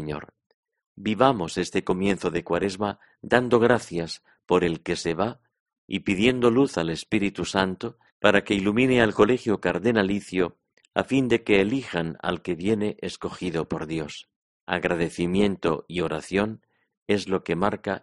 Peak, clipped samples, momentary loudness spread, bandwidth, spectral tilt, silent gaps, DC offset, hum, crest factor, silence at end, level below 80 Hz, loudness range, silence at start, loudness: -2 dBFS; under 0.1%; 11 LU; 11.5 kHz; -5.5 dB/octave; 0.46-0.63 s, 0.86-0.95 s, 5.60-5.66 s, 5.78-5.88 s, 8.12-8.20 s, 14.36-14.67 s, 16.97-17.06 s; under 0.1%; none; 24 dB; 0.05 s; -52 dBFS; 5 LU; 0 s; -24 LUFS